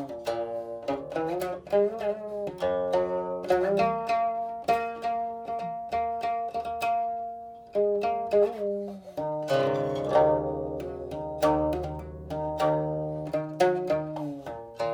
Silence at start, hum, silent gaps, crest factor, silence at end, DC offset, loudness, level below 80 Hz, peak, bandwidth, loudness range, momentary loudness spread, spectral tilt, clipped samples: 0 s; none; none; 18 dB; 0 s; under 0.1%; -29 LUFS; -52 dBFS; -10 dBFS; over 20 kHz; 3 LU; 10 LU; -6.5 dB/octave; under 0.1%